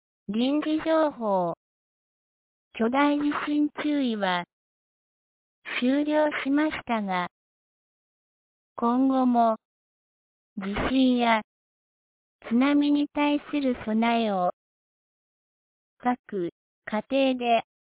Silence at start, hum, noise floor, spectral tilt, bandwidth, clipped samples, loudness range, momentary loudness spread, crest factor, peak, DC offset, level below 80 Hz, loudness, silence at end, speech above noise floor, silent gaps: 0.3 s; none; under -90 dBFS; -9.5 dB/octave; 4 kHz; under 0.1%; 3 LU; 11 LU; 18 dB; -8 dBFS; under 0.1%; -56 dBFS; -25 LUFS; 0.25 s; over 66 dB; 1.57-2.71 s, 4.53-5.62 s, 7.31-8.76 s, 9.65-10.56 s, 11.44-12.39 s, 14.53-15.97 s, 16.19-16.24 s, 16.52-16.82 s